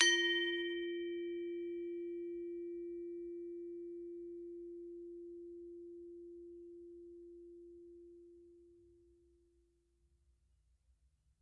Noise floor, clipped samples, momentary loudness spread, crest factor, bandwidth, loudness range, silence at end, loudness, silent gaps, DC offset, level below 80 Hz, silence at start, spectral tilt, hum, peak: -76 dBFS; under 0.1%; 19 LU; 32 dB; 10 kHz; 19 LU; 2.45 s; -42 LUFS; none; under 0.1%; -76 dBFS; 0 s; -0.5 dB/octave; none; -12 dBFS